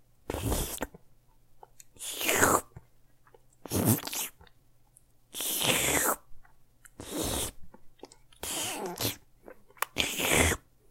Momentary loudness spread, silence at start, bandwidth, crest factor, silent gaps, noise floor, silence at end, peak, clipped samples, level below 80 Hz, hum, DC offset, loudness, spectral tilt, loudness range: 15 LU; 0.25 s; 16.5 kHz; 26 dB; none; -61 dBFS; 0.35 s; -6 dBFS; under 0.1%; -48 dBFS; none; under 0.1%; -29 LUFS; -2.5 dB/octave; 5 LU